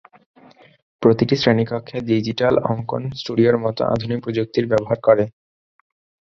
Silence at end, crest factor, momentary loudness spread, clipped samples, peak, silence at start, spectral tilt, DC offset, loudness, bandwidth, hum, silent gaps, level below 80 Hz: 0.9 s; 18 dB; 8 LU; under 0.1%; -2 dBFS; 1 s; -7.5 dB/octave; under 0.1%; -19 LUFS; 7.2 kHz; none; none; -52 dBFS